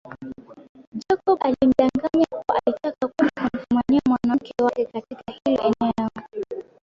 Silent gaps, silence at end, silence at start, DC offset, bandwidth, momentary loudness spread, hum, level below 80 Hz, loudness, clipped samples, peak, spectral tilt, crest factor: 0.69-0.75 s, 0.87-0.92 s; 0.2 s; 0.05 s; under 0.1%; 7.4 kHz; 17 LU; none; -54 dBFS; -22 LUFS; under 0.1%; -4 dBFS; -7 dB/octave; 18 dB